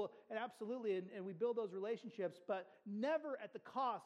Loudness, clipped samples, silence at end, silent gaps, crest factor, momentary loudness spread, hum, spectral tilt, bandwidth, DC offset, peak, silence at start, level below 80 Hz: -44 LUFS; under 0.1%; 0 s; none; 14 dB; 7 LU; none; -6.5 dB/octave; 11 kHz; under 0.1%; -28 dBFS; 0 s; under -90 dBFS